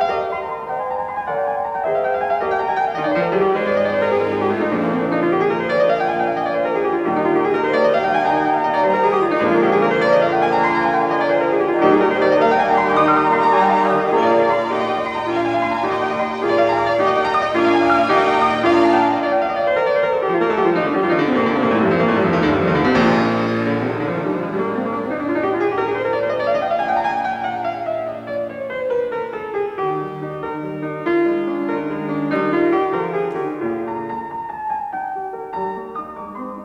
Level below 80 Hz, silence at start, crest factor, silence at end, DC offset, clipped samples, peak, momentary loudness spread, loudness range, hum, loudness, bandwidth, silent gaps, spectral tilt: -52 dBFS; 0 s; 16 dB; 0 s; under 0.1%; under 0.1%; -2 dBFS; 10 LU; 7 LU; none; -18 LUFS; 9.4 kHz; none; -7 dB/octave